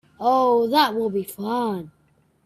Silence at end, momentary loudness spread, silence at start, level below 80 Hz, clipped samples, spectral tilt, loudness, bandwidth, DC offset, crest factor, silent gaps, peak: 0.55 s; 10 LU; 0.2 s; -66 dBFS; under 0.1%; -5 dB/octave; -21 LUFS; 15.5 kHz; under 0.1%; 20 dB; none; -2 dBFS